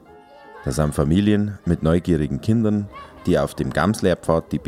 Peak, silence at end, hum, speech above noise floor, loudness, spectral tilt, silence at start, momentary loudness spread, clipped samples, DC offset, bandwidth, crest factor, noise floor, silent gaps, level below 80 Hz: -4 dBFS; 0 s; none; 25 dB; -21 LUFS; -7 dB/octave; 0.5 s; 7 LU; under 0.1%; under 0.1%; 15.5 kHz; 18 dB; -45 dBFS; none; -38 dBFS